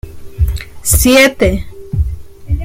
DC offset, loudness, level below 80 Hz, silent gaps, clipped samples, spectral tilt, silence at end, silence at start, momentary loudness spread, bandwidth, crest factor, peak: under 0.1%; -13 LUFS; -20 dBFS; none; under 0.1%; -4 dB/octave; 0 s; 0.05 s; 15 LU; 17 kHz; 14 dB; 0 dBFS